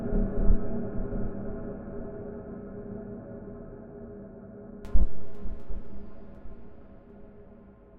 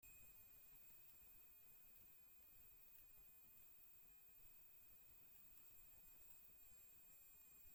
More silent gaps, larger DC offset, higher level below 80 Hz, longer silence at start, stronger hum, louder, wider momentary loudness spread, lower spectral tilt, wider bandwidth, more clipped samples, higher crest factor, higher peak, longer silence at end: neither; neither; first, -34 dBFS vs -82 dBFS; about the same, 0 s vs 0 s; neither; first, -37 LUFS vs -63 LUFS; first, 20 LU vs 2 LU; first, -11 dB/octave vs -2 dB/octave; second, 1.9 kHz vs 17 kHz; neither; about the same, 20 dB vs 16 dB; first, -6 dBFS vs -50 dBFS; about the same, 0 s vs 0 s